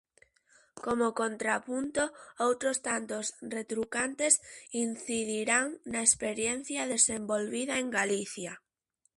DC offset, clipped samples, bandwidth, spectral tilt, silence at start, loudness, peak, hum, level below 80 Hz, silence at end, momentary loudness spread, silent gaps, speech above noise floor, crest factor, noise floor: under 0.1%; under 0.1%; 11.5 kHz; -2 dB/octave; 0.75 s; -30 LUFS; -8 dBFS; none; -68 dBFS; 0.6 s; 10 LU; none; 45 dB; 26 dB; -77 dBFS